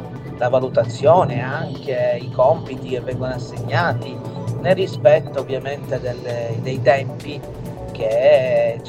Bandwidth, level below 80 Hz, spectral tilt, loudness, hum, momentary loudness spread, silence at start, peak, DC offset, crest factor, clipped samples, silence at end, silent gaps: 11.5 kHz; -46 dBFS; -7 dB/octave; -19 LUFS; none; 14 LU; 0 s; 0 dBFS; under 0.1%; 18 dB; under 0.1%; 0 s; none